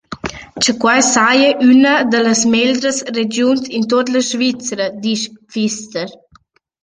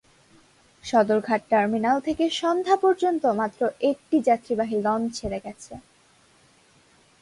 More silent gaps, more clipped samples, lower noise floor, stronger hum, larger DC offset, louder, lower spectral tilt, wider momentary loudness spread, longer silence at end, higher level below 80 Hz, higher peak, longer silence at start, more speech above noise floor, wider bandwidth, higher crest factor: neither; neither; second, -52 dBFS vs -59 dBFS; neither; neither; first, -14 LUFS vs -23 LUFS; second, -2.5 dB/octave vs -5 dB/octave; about the same, 13 LU vs 13 LU; second, 0.7 s vs 1.4 s; first, -52 dBFS vs -58 dBFS; first, 0 dBFS vs -8 dBFS; second, 0.1 s vs 0.85 s; about the same, 38 dB vs 36 dB; second, 10 kHz vs 11.5 kHz; about the same, 14 dB vs 18 dB